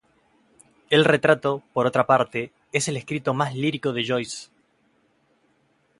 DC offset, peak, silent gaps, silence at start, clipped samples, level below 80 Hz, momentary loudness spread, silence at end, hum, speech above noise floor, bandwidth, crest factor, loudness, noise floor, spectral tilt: under 0.1%; -4 dBFS; none; 0.9 s; under 0.1%; -66 dBFS; 9 LU; 1.55 s; none; 43 dB; 11.5 kHz; 22 dB; -22 LUFS; -65 dBFS; -4.5 dB/octave